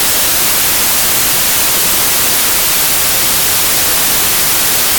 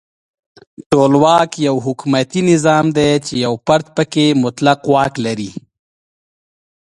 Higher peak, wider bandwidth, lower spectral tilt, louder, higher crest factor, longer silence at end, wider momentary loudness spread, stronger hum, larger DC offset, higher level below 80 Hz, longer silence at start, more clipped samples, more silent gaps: about the same, 0 dBFS vs 0 dBFS; first, 19.5 kHz vs 11.5 kHz; second, 0 dB/octave vs -5.5 dB/octave; first, -8 LUFS vs -14 LUFS; second, 10 dB vs 16 dB; second, 0 s vs 1.3 s; second, 0 LU vs 8 LU; neither; neither; first, -36 dBFS vs -50 dBFS; second, 0 s vs 0.8 s; neither; second, none vs 0.86-0.90 s